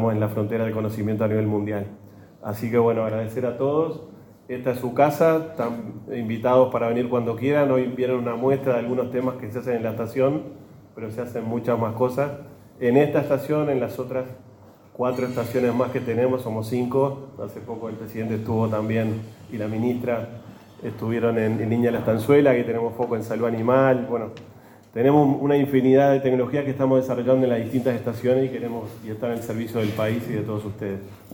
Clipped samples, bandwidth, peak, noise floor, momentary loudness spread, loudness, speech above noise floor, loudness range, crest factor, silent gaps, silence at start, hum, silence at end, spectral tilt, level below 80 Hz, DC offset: under 0.1%; 17.5 kHz; -4 dBFS; -48 dBFS; 14 LU; -23 LUFS; 25 dB; 6 LU; 20 dB; none; 0 s; none; 0 s; -8 dB/octave; -60 dBFS; under 0.1%